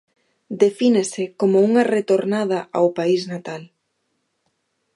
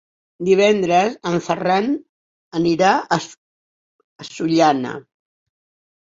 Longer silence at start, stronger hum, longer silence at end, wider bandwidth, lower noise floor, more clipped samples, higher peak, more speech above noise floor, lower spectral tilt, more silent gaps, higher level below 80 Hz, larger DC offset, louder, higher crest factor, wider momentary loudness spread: about the same, 0.5 s vs 0.4 s; neither; first, 1.3 s vs 1.05 s; first, 11.5 kHz vs 7.8 kHz; second, -72 dBFS vs under -90 dBFS; neither; about the same, -2 dBFS vs -2 dBFS; second, 53 dB vs over 73 dB; about the same, -5.5 dB/octave vs -5.5 dB/octave; second, none vs 2.09-2.51 s, 3.37-4.19 s; second, -74 dBFS vs -60 dBFS; neither; about the same, -19 LUFS vs -18 LUFS; about the same, 18 dB vs 18 dB; about the same, 14 LU vs 15 LU